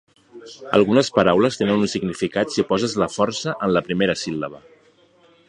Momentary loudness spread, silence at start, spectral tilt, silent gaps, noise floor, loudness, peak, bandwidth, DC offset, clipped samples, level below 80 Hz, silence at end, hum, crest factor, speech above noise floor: 10 LU; 0.35 s; -5 dB/octave; none; -55 dBFS; -20 LUFS; 0 dBFS; 10.5 kHz; under 0.1%; under 0.1%; -54 dBFS; 0.9 s; none; 20 dB; 36 dB